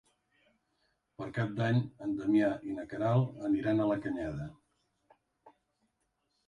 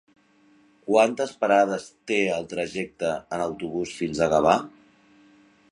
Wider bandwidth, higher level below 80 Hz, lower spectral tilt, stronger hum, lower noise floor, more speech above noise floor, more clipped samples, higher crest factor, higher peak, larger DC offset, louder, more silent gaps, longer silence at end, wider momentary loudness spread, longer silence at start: second, 9.8 kHz vs 11 kHz; second, -64 dBFS vs -58 dBFS; first, -9 dB/octave vs -5 dB/octave; neither; first, -80 dBFS vs -59 dBFS; first, 48 dB vs 35 dB; neither; about the same, 18 dB vs 22 dB; second, -16 dBFS vs -4 dBFS; neither; second, -32 LUFS vs -24 LUFS; neither; about the same, 1 s vs 1 s; about the same, 11 LU vs 10 LU; first, 1.2 s vs 0.85 s